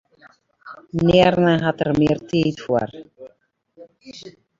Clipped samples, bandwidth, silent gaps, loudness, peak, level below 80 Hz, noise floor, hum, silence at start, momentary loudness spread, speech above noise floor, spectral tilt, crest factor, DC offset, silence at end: under 0.1%; 7.6 kHz; none; -19 LUFS; -2 dBFS; -48 dBFS; -61 dBFS; none; 0.65 s; 25 LU; 42 dB; -7 dB/octave; 20 dB; under 0.1%; 0.3 s